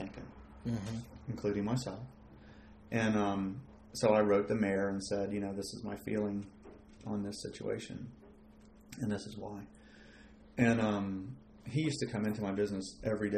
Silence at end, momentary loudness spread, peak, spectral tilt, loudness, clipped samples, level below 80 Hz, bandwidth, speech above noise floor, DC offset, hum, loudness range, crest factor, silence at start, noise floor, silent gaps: 0 s; 20 LU; -14 dBFS; -6 dB/octave; -36 LUFS; under 0.1%; -60 dBFS; 14 kHz; 24 dB; under 0.1%; none; 9 LU; 22 dB; 0 s; -58 dBFS; none